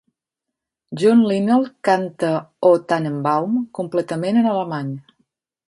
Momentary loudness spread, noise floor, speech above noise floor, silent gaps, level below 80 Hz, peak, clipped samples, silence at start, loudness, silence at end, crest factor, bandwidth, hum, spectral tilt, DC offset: 9 LU; -83 dBFS; 65 dB; none; -68 dBFS; -2 dBFS; under 0.1%; 0.9 s; -19 LUFS; 0.7 s; 18 dB; 11.5 kHz; none; -7 dB/octave; under 0.1%